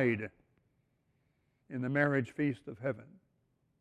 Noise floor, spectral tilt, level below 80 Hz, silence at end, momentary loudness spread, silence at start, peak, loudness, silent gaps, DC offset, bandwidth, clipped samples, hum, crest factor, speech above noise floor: -76 dBFS; -8.5 dB/octave; -70 dBFS; 0.75 s; 15 LU; 0 s; -16 dBFS; -34 LUFS; none; under 0.1%; 10 kHz; under 0.1%; none; 20 dB; 43 dB